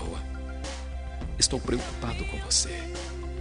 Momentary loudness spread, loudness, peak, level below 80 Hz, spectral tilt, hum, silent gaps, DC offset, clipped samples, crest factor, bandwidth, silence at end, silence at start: 12 LU; -29 LUFS; -8 dBFS; -36 dBFS; -3 dB/octave; none; none; 0.2%; under 0.1%; 22 dB; 11 kHz; 0 s; 0 s